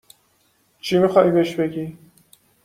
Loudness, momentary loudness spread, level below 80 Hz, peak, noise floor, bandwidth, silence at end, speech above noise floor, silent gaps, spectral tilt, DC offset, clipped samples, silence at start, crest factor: -19 LUFS; 17 LU; -60 dBFS; -2 dBFS; -63 dBFS; 15.5 kHz; 0.7 s; 45 dB; none; -6.5 dB/octave; under 0.1%; under 0.1%; 0.85 s; 20 dB